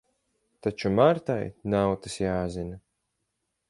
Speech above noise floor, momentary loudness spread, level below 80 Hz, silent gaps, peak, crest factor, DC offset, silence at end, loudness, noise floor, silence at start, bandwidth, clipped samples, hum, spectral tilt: 54 dB; 12 LU; -52 dBFS; none; -6 dBFS; 22 dB; under 0.1%; 0.9 s; -27 LUFS; -80 dBFS; 0.65 s; 11.5 kHz; under 0.1%; none; -6.5 dB/octave